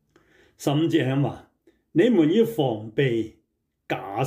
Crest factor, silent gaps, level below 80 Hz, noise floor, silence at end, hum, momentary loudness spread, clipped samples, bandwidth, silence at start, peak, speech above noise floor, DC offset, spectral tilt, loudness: 16 dB; none; -66 dBFS; -74 dBFS; 0 s; none; 13 LU; under 0.1%; 16 kHz; 0.6 s; -8 dBFS; 52 dB; under 0.1%; -7 dB/octave; -23 LUFS